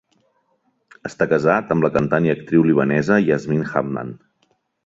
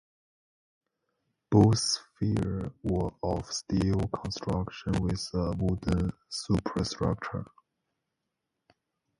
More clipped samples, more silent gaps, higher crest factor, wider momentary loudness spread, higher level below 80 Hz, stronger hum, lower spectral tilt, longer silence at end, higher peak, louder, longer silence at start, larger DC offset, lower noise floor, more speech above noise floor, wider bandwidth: neither; neither; about the same, 18 dB vs 22 dB; about the same, 12 LU vs 10 LU; second, -52 dBFS vs -44 dBFS; neither; first, -8 dB/octave vs -6 dB/octave; second, 0.7 s vs 1.75 s; first, -2 dBFS vs -8 dBFS; first, -18 LUFS vs -30 LUFS; second, 1.05 s vs 1.5 s; neither; second, -66 dBFS vs -84 dBFS; second, 48 dB vs 56 dB; second, 7.8 kHz vs 11.5 kHz